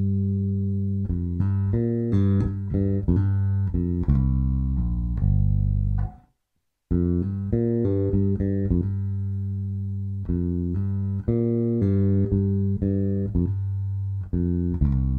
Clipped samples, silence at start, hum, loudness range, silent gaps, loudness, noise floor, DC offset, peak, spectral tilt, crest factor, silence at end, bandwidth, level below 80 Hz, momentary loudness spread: under 0.1%; 0 s; none; 2 LU; none; -25 LUFS; -75 dBFS; under 0.1%; -8 dBFS; -12.5 dB/octave; 16 dB; 0 s; 2.2 kHz; -32 dBFS; 6 LU